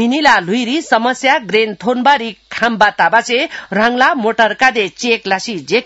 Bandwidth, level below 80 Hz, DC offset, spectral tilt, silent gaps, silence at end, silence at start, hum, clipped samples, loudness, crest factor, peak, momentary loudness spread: 8.2 kHz; -56 dBFS; under 0.1%; -3.5 dB/octave; none; 0 s; 0 s; none; 0.1%; -13 LUFS; 14 dB; 0 dBFS; 6 LU